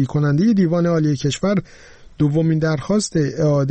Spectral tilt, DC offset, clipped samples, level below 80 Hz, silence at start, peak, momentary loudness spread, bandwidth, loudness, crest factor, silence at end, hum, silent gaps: -7 dB/octave; under 0.1%; under 0.1%; -46 dBFS; 0 s; -8 dBFS; 5 LU; 8.8 kHz; -18 LUFS; 10 dB; 0 s; none; none